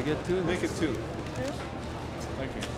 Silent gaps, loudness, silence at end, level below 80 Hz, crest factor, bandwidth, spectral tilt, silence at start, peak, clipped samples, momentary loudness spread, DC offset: none; -32 LUFS; 0 s; -46 dBFS; 16 dB; 15.5 kHz; -5.5 dB/octave; 0 s; -16 dBFS; under 0.1%; 8 LU; under 0.1%